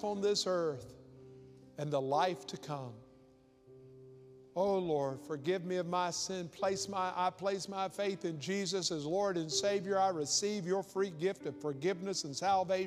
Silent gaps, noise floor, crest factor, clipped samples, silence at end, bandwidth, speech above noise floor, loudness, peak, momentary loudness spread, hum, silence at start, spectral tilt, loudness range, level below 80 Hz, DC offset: none; -64 dBFS; 18 dB; under 0.1%; 0 s; 14.5 kHz; 29 dB; -35 LUFS; -18 dBFS; 10 LU; none; 0 s; -4 dB/octave; 6 LU; -74 dBFS; under 0.1%